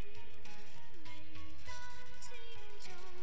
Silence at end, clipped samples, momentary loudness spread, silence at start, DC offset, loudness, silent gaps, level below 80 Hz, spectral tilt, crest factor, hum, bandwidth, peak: 0 s; under 0.1%; 5 LU; 0 s; 3%; -53 LUFS; none; -62 dBFS; -4 dB/octave; 16 dB; none; 8 kHz; -26 dBFS